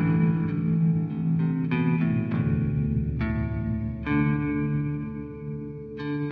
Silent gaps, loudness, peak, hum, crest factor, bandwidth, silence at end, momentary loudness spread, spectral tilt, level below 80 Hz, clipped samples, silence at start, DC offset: none; -26 LUFS; -12 dBFS; none; 12 dB; 4.6 kHz; 0 s; 11 LU; -11.5 dB/octave; -40 dBFS; under 0.1%; 0 s; under 0.1%